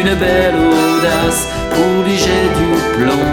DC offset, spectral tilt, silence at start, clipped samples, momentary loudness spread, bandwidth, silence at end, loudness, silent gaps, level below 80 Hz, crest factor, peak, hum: under 0.1%; -4.5 dB/octave; 0 s; under 0.1%; 3 LU; over 20 kHz; 0 s; -13 LUFS; none; -28 dBFS; 12 dB; 0 dBFS; none